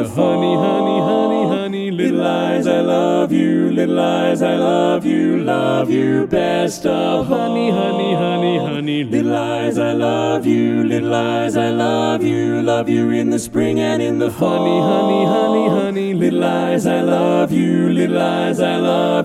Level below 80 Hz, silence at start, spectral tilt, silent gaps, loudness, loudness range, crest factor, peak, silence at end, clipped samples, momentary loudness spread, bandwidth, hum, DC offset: -54 dBFS; 0 s; -6.5 dB/octave; none; -16 LUFS; 2 LU; 14 dB; -2 dBFS; 0 s; under 0.1%; 3 LU; 14 kHz; none; under 0.1%